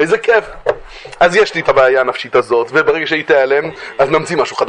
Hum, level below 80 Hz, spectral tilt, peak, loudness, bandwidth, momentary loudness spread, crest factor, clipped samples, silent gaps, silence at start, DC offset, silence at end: none; -46 dBFS; -4.5 dB/octave; 0 dBFS; -13 LUFS; 10 kHz; 10 LU; 14 dB; under 0.1%; none; 0 s; under 0.1%; 0 s